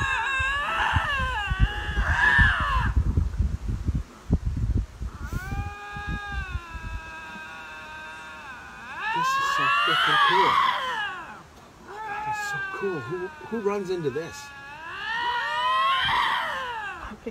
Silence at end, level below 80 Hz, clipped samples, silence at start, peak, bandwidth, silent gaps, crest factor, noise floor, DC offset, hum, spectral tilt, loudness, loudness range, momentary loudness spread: 0 s; -34 dBFS; under 0.1%; 0 s; -6 dBFS; 15.5 kHz; none; 20 dB; -48 dBFS; under 0.1%; none; -4.5 dB/octave; -25 LUFS; 11 LU; 18 LU